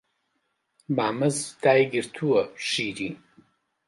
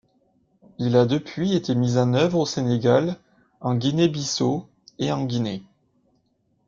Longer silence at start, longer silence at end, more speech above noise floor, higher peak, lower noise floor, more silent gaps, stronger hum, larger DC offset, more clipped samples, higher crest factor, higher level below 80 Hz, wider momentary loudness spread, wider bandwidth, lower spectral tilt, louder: about the same, 0.9 s vs 0.8 s; second, 0.7 s vs 1.05 s; first, 51 dB vs 46 dB; about the same, -6 dBFS vs -6 dBFS; first, -75 dBFS vs -68 dBFS; neither; neither; neither; neither; about the same, 20 dB vs 18 dB; second, -68 dBFS vs -60 dBFS; about the same, 11 LU vs 10 LU; first, 11.5 kHz vs 7.6 kHz; second, -4.5 dB/octave vs -6 dB/octave; about the same, -25 LUFS vs -23 LUFS